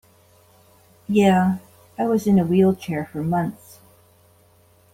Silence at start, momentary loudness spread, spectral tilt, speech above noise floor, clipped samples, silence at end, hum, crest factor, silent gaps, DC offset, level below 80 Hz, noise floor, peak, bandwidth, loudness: 1.1 s; 14 LU; -7.5 dB/octave; 37 dB; under 0.1%; 1.4 s; none; 18 dB; none; under 0.1%; -58 dBFS; -56 dBFS; -6 dBFS; 15.5 kHz; -20 LUFS